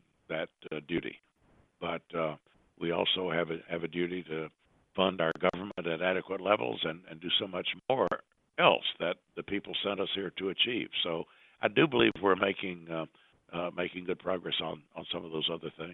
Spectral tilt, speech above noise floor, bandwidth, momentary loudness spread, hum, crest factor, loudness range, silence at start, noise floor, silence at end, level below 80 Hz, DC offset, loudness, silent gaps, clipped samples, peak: -7 dB/octave; 35 dB; 6 kHz; 13 LU; none; 24 dB; 5 LU; 0.3 s; -67 dBFS; 0 s; -68 dBFS; under 0.1%; -32 LUFS; none; under 0.1%; -8 dBFS